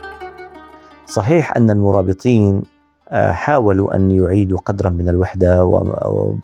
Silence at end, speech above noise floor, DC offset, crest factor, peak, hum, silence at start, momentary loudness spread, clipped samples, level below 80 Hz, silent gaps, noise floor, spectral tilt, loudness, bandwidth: 0 s; 27 dB; under 0.1%; 14 dB; 0 dBFS; none; 0 s; 9 LU; under 0.1%; -38 dBFS; none; -40 dBFS; -8.5 dB/octave; -15 LUFS; 10 kHz